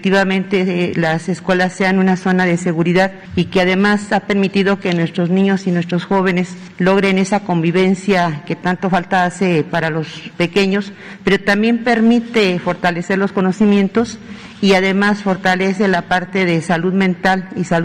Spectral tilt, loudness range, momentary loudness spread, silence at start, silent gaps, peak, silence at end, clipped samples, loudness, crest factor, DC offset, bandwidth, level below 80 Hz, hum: -6 dB/octave; 1 LU; 6 LU; 0 s; none; -4 dBFS; 0 s; under 0.1%; -15 LUFS; 10 dB; under 0.1%; 10 kHz; -50 dBFS; none